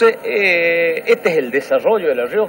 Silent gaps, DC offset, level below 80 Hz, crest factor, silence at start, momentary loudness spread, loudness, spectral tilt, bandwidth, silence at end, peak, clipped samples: none; under 0.1%; -64 dBFS; 14 dB; 0 s; 4 LU; -15 LUFS; -4.5 dB/octave; 16.5 kHz; 0 s; -2 dBFS; under 0.1%